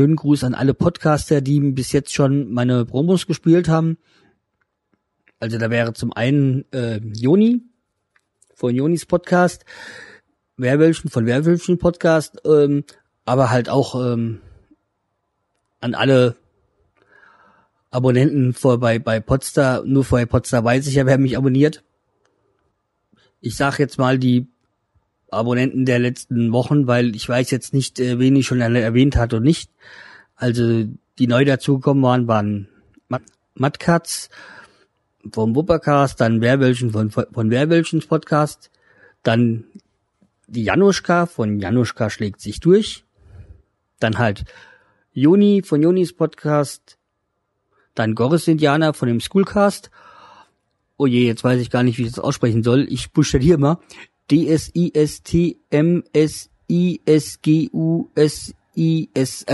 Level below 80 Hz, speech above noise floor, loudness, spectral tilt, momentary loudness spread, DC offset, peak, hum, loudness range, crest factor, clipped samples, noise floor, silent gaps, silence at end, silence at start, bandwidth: -42 dBFS; 56 dB; -18 LUFS; -6.5 dB/octave; 10 LU; under 0.1%; -2 dBFS; none; 4 LU; 16 dB; under 0.1%; -73 dBFS; none; 0 s; 0 s; 12 kHz